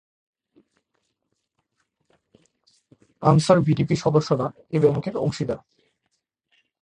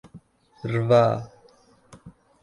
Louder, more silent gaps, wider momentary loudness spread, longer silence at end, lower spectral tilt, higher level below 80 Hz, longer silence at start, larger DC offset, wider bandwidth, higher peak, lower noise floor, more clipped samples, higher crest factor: about the same, -22 LUFS vs -22 LUFS; neither; second, 10 LU vs 19 LU; first, 1.25 s vs 0.35 s; about the same, -7 dB/octave vs -8 dB/octave; about the same, -56 dBFS vs -58 dBFS; first, 3.2 s vs 0.15 s; neither; about the same, 10.5 kHz vs 11 kHz; first, -2 dBFS vs -6 dBFS; first, -77 dBFS vs -57 dBFS; neither; about the same, 22 dB vs 20 dB